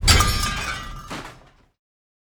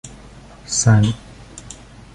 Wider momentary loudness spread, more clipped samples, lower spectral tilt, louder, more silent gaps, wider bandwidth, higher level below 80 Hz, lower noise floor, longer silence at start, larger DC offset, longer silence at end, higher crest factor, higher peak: second, 19 LU vs 24 LU; neither; second, -2.5 dB/octave vs -4.5 dB/octave; second, -21 LUFS vs -17 LUFS; neither; first, over 20 kHz vs 11 kHz; first, -28 dBFS vs -42 dBFS; first, -49 dBFS vs -41 dBFS; about the same, 0 s vs 0.05 s; neither; first, 0.9 s vs 0.4 s; about the same, 20 dB vs 18 dB; about the same, -2 dBFS vs -4 dBFS